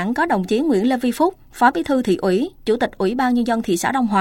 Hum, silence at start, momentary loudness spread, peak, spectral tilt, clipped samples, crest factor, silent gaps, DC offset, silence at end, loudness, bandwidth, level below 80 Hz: none; 0 s; 3 LU; -2 dBFS; -5.5 dB/octave; under 0.1%; 16 dB; none; under 0.1%; 0 s; -19 LUFS; 17 kHz; -48 dBFS